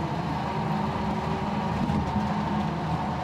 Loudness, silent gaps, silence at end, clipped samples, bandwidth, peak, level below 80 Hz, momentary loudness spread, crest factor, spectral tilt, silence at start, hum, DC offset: -28 LUFS; none; 0 s; under 0.1%; 12 kHz; -14 dBFS; -44 dBFS; 2 LU; 14 dB; -7.5 dB/octave; 0 s; none; under 0.1%